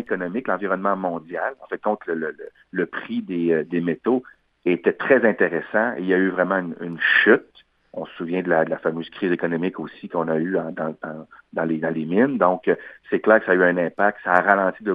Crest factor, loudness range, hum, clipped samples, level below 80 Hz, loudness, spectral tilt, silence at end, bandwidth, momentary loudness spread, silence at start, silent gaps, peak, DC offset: 22 dB; 6 LU; none; under 0.1%; -70 dBFS; -22 LUFS; -8.5 dB/octave; 0 s; 5 kHz; 12 LU; 0 s; none; 0 dBFS; under 0.1%